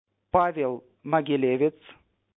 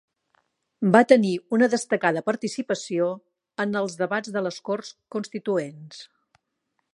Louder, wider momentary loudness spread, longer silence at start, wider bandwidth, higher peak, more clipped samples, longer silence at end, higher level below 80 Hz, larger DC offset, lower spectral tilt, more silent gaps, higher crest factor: about the same, -25 LUFS vs -24 LUFS; second, 7 LU vs 17 LU; second, 0.35 s vs 0.8 s; second, 4 kHz vs 11.5 kHz; second, -6 dBFS vs -2 dBFS; neither; second, 0.65 s vs 0.9 s; first, -56 dBFS vs -78 dBFS; neither; first, -9.5 dB/octave vs -5.5 dB/octave; neither; about the same, 20 dB vs 24 dB